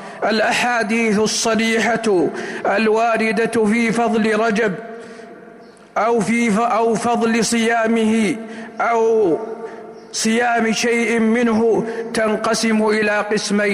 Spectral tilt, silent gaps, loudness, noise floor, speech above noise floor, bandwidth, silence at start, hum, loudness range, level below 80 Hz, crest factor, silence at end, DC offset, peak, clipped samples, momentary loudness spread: -4 dB/octave; none; -17 LUFS; -42 dBFS; 25 dB; 15.5 kHz; 0 s; none; 2 LU; -58 dBFS; 10 dB; 0 s; under 0.1%; -8 dBFS; under 0.1%; 8 LU